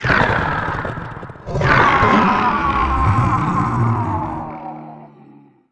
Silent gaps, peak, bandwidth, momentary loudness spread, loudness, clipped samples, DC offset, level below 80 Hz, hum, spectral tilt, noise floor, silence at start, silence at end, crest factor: none; 0 dBFS; 9.2 kHz; 19 LU; -16 LUFS; under 0.1%; under 0.1%; -32 dBFS; none; -7 dB/octave; -46 dBFS; 0 s; 0.65 s; 18 dB